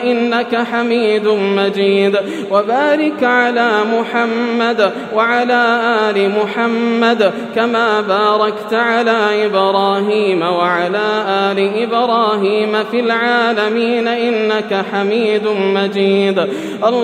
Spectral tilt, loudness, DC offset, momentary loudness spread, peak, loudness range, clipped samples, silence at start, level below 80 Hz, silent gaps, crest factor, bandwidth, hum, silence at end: -5.5 dB/octave; -14 LUFS; under 0.1%; 3 LU; 0 dBFS; 1 LU; under 0.1%; 0 s; -72 dBFS; none; 14 dB; 10 kHz; none; 0 s